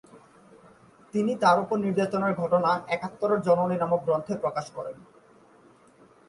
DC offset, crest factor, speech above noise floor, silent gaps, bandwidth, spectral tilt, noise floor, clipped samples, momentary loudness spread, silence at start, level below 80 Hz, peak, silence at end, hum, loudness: under 0.1%; 18 dB; 31 dB; none; 11.5 kHz; -6.5 dB/octave; -57 dBFS; under 0.1%; 11 LU; 0.15 s; -68 dBFS; -8 dBFS; 1.25 s; none; -26 LUFS